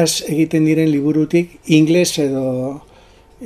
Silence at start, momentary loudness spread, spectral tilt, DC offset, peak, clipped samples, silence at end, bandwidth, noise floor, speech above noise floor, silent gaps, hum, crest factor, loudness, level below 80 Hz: 0 s; 9 LU; -5 dB/octave; under 0.1%; 0 dBFS; under 0.1%; 0 s; 15.5 kHz; -46 dBFS; 31 dB; none; none; 16 dB; -16 LUFS; -52 dBFS